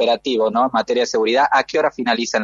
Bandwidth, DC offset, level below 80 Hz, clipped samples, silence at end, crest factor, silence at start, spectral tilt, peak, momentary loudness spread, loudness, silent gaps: 7.6 kHz; under 0.1%; -60 dBFS; under 0.1%; 0 s; 14 dB; 0 s; -3 dB/octave; -2 dBFS; 3 LU; -17 LUFS; none